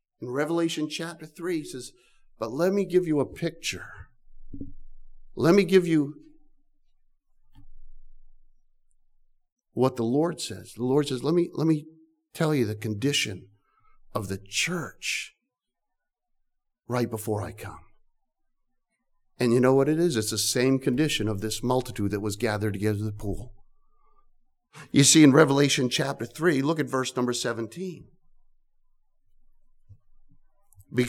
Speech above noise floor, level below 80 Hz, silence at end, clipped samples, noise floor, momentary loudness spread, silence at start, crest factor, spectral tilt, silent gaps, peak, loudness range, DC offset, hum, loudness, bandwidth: 57 dB; -52 dBFS; 0 s; under 0.1%; -82 dBFS; 17 LU; 0.2 s; 22 dB; -4.5 dB/octave; 9.52-9.56 s; -4 dBFS; 12 LU; under 0.1%; none; -25 LUFS; 17.5 kHz